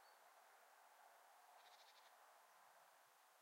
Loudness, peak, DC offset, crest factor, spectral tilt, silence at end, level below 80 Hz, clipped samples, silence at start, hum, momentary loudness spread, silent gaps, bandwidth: -69 LUFS; -54 dBFS; under 0.1%; 16 dB; 1 dB/octave; 0 s; under -90 dBFS; under 0.1%; 0 s; none; 3 LU; none; 16 kHz